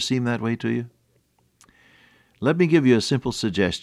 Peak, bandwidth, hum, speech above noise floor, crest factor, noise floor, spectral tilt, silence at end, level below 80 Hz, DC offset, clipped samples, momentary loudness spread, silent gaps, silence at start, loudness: -6 dBFS; 13 kHz; none; 44 dB; 18 dB; -65 dBFS; -5.5 dB/octave; 0.05 s; -54 dBFS; under 0.1%; under 0.1%; 9 LU; none; 0 s; -22 LUFS